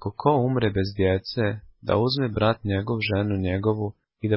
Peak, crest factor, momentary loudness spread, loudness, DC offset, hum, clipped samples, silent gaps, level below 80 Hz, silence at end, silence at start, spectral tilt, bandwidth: -6 dBFS; 18 dB; 6 LU; -25 LUFS; under 0.1%; none; under 0.1%; none; -42 dBFS; 0 s; 0 s; -11 dB/octave; 5.8 kHz